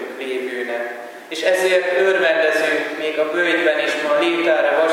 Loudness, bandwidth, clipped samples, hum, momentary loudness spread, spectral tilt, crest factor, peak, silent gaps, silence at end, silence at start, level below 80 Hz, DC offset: -18 LUFS; 16.5 kHz; under 0.1%; none; 10 LU; -2.5 dB/octave; 16 dB; -2 dBFS; none; 0 s; 0 s; -86 dBFS; under 0.1%